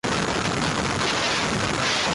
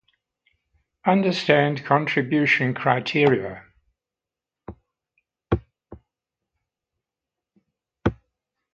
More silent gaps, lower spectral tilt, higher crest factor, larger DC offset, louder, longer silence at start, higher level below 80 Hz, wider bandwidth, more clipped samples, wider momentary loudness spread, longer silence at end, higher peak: neither; second, -3 dB/octave vs -7 dB/octave; second, 12 dB vs 24 dB; neither; about the same, -23 LUFS vs -21 LUFS; second, 0.05 s vs 1.05 s; about the same, -44 dBFS vs -48 dBFS; first, 11.5 kHz vs 8.2 kHz; neither; second, 2 LU vs 9 LU; second, 0 s vs 0.6 s; second, -12 dBFS vs 0 dBFS